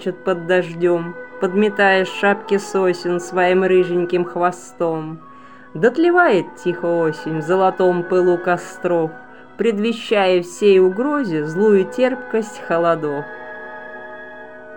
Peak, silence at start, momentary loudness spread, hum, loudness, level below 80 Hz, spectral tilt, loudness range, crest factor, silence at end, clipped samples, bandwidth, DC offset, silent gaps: -2 dBFS; 0 s; 17 LU; none; -18 LUFS; -66 dBFS; -6 dB/octave; 2 LU; 16 dB; 0 s; under 0.1%; 16.5 kHz; 0.5%; none